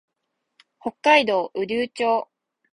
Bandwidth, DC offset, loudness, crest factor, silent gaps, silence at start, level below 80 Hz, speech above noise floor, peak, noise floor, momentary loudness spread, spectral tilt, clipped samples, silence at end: 11.5 kHz; under 0.1%; -21 LUFS; 22 dB; none; 0.85 s; -68 dBFS; 57 dB; -2 dBFS; -78 dBFS; 17 LU; -3.5 dB/octave; under 0.1%; 0.5 s